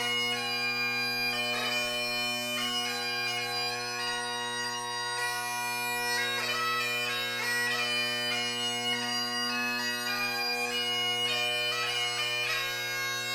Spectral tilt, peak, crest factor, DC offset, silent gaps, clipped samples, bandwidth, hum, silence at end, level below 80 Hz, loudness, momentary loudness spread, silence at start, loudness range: -1 dB/octave; -18 dBFS; 12 dB; under 0.1%; none; under 0.1%; over 20 kHz; none; 0 s; -68 dBFS; -29 LUFS; 4 LU; 0 s; 2 LU